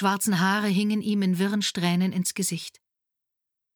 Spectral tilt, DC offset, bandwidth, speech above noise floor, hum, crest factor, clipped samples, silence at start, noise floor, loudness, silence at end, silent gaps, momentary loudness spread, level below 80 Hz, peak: -4.5 dB/octave; under 0.1%; over 20 kHz; 60 dB; none; 18 dB; under 0.1%; 0 s; -85 dBFS; -25 LUFS; 1.05 s; none; 6 LU; -74 dBFS; -8 dBFS